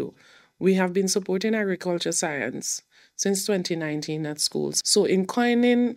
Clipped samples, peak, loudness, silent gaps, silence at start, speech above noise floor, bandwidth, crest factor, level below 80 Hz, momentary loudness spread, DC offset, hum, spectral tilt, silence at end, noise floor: under 0.1%; -8 dBFS; -24 LUFS; none; 0 s; 31 dB; 16 kHz; 16 dB; -74 dBFS; 9 LU; under 0.1%; none; -3.5 dB/octave; 0 s; -55 dBFS